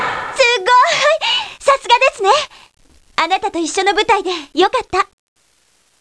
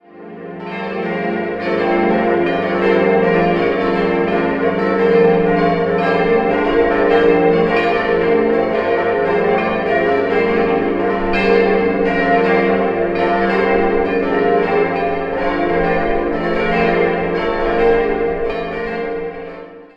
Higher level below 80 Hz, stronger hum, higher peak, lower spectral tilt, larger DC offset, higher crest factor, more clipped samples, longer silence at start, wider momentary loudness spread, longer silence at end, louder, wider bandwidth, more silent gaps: second, -50 dBFS vs -38 dBFS; neither; about the same, 0 dBFS vs -2 dBFS; second, -1.5 dB/octave vs -8 dB/octave; neither; about the same, 16 dB vs 14 dB; neither; second, 0 s vs 0.15 s; about the same, 8 LU vs 8 LU; first, 0.95 s vs 0.1 s; about the same, -14 LUFS vs -15 LUFS; first, 11 kHz vs 5.8 kHz; neither